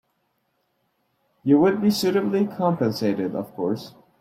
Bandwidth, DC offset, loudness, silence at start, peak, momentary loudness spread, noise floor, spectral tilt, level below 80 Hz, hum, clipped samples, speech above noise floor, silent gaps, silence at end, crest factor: 15.5 kHz; under 0.1%; -22 LUFS; 1.45 s; -6 dBFS; 10 LU; -71 dBFS; -6.5 dB/octave; -66 dBFS; none; under 0.1%; 50 dB; none; 0.3 s; 16 dB